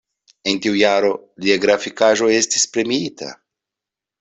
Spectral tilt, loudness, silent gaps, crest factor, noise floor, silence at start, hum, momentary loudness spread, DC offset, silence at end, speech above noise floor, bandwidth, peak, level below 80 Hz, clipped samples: -2.5 dB/octave; -17 LUFS; none; 16 dB; -86 dBFS; 0.45 s; none; 10 LU; under 0.1%; 0.85 s; 69 dB; 8.4 kHz; -2 dBFS; -60 dBFS; under 0.1%